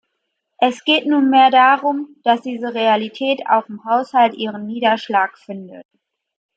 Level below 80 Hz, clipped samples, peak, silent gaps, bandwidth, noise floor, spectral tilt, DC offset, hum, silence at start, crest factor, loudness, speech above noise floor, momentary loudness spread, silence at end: -74 dBFS; under 0.1%; -2 dBFS; none; 8 kHz; -74 dBFS; -5 dB/octave; under 0.1%; none; 0.6 s; 16 dB; -16 LUFS; 58 dB; 12 LU; 0.75 s